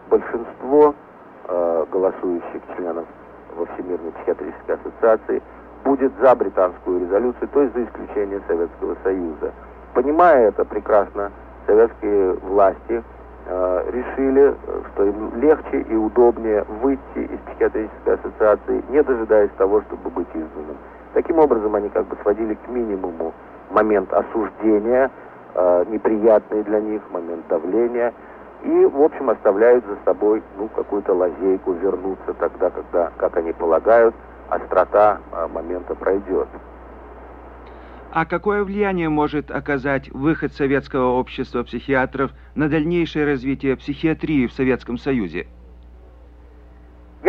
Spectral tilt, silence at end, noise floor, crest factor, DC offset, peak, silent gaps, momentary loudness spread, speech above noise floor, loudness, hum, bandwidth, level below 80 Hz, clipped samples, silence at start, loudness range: -9 dB/octave; 0 s; -44 dBFS; 16 dB; under 0.1%; -4 dBFS; none; 13 LU; 25 dB; -20 LUFS; none; 5.4 kHz; -44 dBFS; under 0.1%; 0.05 s; 5 LU